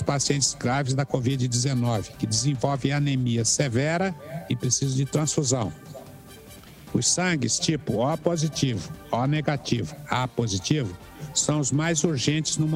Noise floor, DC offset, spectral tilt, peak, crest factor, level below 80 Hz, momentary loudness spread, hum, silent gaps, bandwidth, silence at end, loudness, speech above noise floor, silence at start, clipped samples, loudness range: -45 dBFS; under 0.1%; -4.5 dB/octave; -8 dBFS; 18 dB; -52 dBFS; 9 LU; none; none; 15.5 kHz; 0 s; -25 LUFS; 21 dB; 0 s; under 0.1%; 2 LU